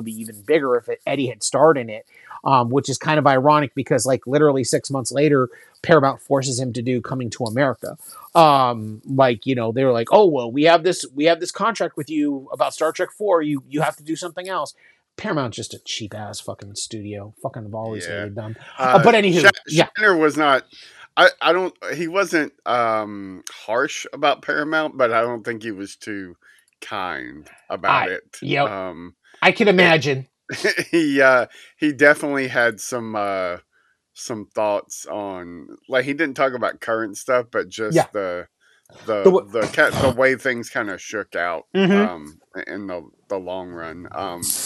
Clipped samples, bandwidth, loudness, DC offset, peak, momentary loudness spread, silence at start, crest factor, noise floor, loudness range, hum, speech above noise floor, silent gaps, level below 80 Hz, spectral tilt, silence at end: under 0.1%; 14 kHz; -19 LUFS; under 0.1%; 0 dBFS; 17 LU; 0 s; 20 dB; -61 dBFS; 8 LU; none; 41 dB; none; -62 dBFS; -4.5 dB/octave; 0 s